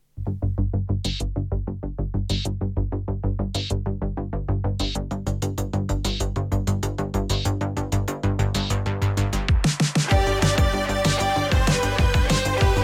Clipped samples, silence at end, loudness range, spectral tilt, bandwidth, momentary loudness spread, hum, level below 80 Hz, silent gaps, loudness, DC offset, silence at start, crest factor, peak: under 0.1%; 0 s; 6 LU; -5 dB/octave; 15.5 kHz; 8 LU; none; -28 dBFS; none; -24 LUFS; under 0.1%; 0.15 s; 14 dB; -10 dBFS